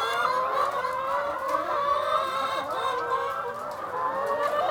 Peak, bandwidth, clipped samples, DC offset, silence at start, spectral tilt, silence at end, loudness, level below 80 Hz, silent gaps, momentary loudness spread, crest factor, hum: -12 dBFS; over 20 kHz; under 0.1%; under 0.1%; 0 s; -3 dB/octave; 0 s; -27 LUFS; -64 dBFS; none; 5 LU; 16 dB; none